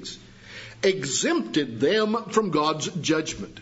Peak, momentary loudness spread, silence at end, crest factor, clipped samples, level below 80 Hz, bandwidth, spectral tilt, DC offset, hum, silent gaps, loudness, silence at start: -8 dBFS; 18 LU; 0 s; 18 dB; under 0.1%; -58 dBFS; 8 kHz; -3.5 dB/octave; under 0.1%; none; none; -24 LUFS; 0 s